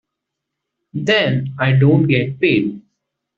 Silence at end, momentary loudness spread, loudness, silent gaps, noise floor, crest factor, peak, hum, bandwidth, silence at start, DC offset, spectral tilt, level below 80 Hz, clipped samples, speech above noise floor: 0.6 s; 11 LU; -16 LUFS; none; -79 dBFS; 16 dB; -2 dBFS; none; 7.2 kHz; 0.95 s; under 0.1%; -5.5 dB/octave; -56 dBFS; under 0.1%; 64 dB